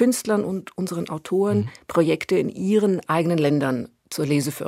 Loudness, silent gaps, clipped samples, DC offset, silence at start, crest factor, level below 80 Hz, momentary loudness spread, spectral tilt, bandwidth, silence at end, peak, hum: -23 LUFS; none; under 0.1%; under 0.1%; 0 s; 16 dB; -62 dBFS; 9 LU; -6 dB/octave; 16 kHz; 0 s; -6 dBFS; none